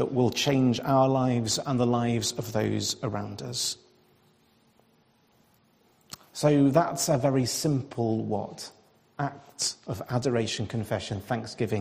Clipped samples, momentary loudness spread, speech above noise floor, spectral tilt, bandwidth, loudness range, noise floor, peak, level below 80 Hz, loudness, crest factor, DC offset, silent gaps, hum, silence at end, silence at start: under 0.1%; 12 LU; 38 dB; -5 dB/octave; 15.5 kHz; 8 LU; -64 dBFS; -8 dBFS; -62 dBFS; -27 LUFS; 20 dB; under 0.1%; none; none; 0 s; 0 s